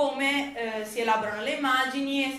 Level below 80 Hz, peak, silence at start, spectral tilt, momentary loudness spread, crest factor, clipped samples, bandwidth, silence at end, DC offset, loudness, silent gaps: -66 dBFS; -10 dBFS; 0 s; -2.5 dB/octave; 7 LU; 16 dB; under 0.1%; 15 kHz; 0 s; under 0.1%; -27 LUFS; none